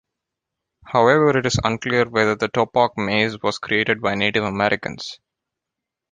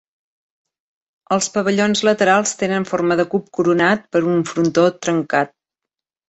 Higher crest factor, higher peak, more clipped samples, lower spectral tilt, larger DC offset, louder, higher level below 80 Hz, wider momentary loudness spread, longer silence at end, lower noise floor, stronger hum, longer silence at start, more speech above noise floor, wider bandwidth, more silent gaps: about the same, 18 dB vs 18 dB; about the same, -2 dBFS vs -2 dBFS; neither; about the same, -5 dB/octave vs -4.5 dB/octave; neither; about the same, -19 LUFS vs -17 LUFS; first, -48 dBFS vs -60 dBFS; first, 8 LU vs 5 LU; first, 0.95 s vs 0.8 s; about the same, -84 dBFS vs -85 dBFS; neither; second, 0.85 s vs 1.3 s; about the same, 65 dB vs 68 dB; first, 9.6 kHz vs 8.2 kHz; neither